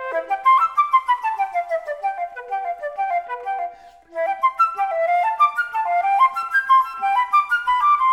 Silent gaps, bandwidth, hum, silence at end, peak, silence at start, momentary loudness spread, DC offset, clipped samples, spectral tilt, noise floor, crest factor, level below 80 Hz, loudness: none; 15.5 kHz; none; 0 s; -6 dBFS; 0 s; 11 LU; under 0.1%; under 0.1%; -1 dB/octave; -40 dBFS; 14 dB; -64 dBFS; -20 LUFS